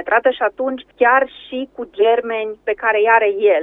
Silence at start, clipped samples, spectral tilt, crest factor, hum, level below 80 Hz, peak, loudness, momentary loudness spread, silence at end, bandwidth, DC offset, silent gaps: 0 s; under 0.1%; -5.5 dB/octave; 16 dB; none; -58 dBFS; 0 dBFS; -16 LUFS; 13 LU; 0 s; 4 kHz; under 0.1%; none